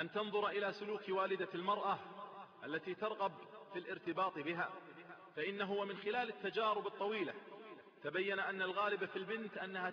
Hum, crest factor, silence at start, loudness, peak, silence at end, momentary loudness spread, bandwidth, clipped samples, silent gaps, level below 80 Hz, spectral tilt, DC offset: none; 16 dB; 0 s; -41 LUFS; -24 dBFS; 0 s; 14 LU; 6.6 kHz; under 0.1%; none; -88 dBFS; -2 dB/octave; under 0.1%